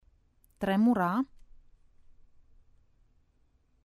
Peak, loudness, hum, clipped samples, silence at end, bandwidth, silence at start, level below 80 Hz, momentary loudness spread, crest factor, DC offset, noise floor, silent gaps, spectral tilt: -16 dBFS; -29 LUFS; none; under 0.1%; 2.6 s; 13.5 kHz; 0.6 s; -62 dBFS; 11 LU; 18 dB; under 0.1%; -68 dBFS; none; -8 dB/octave